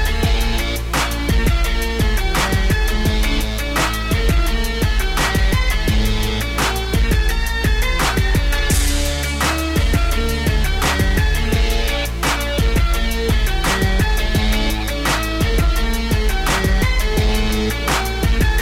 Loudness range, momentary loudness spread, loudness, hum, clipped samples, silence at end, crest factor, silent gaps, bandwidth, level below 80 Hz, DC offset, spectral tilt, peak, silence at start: 1 LU; 2 LU; -18 LUFS; none; under 0.1%; 0 s; 10 dB; none; 16.5 kHz; -18 dBFS; 0.5%; -4.5 dB/octave; -6 dBFS; 0 s